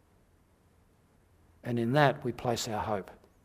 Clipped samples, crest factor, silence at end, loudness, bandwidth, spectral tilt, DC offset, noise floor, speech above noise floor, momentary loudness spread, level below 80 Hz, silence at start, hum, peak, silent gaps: under 0.1%; 26 dB; 0.3 s; -30 LUFS; 15.5 kHz; -5.5 dB/octave; under 0.1%; -65 dBFS; 36 dB; 14 LU; -62 dBFS; 1.65 s; none; -8 dBFS; none